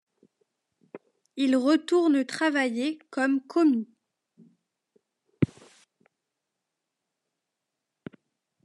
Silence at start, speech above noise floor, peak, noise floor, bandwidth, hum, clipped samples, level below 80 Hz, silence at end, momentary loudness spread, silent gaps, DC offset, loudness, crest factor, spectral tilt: 0.95 s; 60 dB; -8 dBFS; -84 dBFS; 11.5 kHz; none; under 0.1%; -74 dBFS; 3.2 s; 22 LU; none; under 0.1%; -25 LUFS; 20 dB; -6 dB/octave